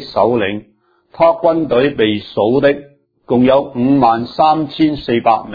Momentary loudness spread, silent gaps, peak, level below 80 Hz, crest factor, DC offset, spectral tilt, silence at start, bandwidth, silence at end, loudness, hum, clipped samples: 5 LU; none; 0 dBFS; -46 dBFS; 14 dB; under 0.1%; -8.5 dB/octave; 0 s; 5 kHz; 0 s; -14 LUFS; none; under 0.1%